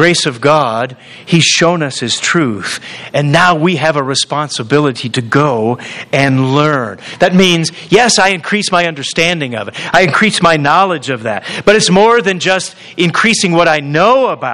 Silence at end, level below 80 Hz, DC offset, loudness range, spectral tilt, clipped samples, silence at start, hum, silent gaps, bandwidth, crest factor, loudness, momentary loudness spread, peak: 0 s; -48 dBFS; 0.2%; 2 LU; -4 dB/octave; 0.3%; 0 s; none; none; 12.5 kHz; 12 dB; -11 LUFS; 9 LU; 0 dBFS